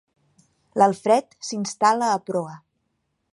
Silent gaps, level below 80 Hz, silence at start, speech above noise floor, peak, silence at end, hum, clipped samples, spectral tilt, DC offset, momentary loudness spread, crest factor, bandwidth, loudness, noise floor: none; -74 dBFS; 0.75 s; 53 dB; -4 dBFS; 0.75 s; none; under 0.1%; -4.5 dB/octave; under 0.1%; 13 LU; 20 dB; 11.5 kHz; -22 LUFS; -74 dBFS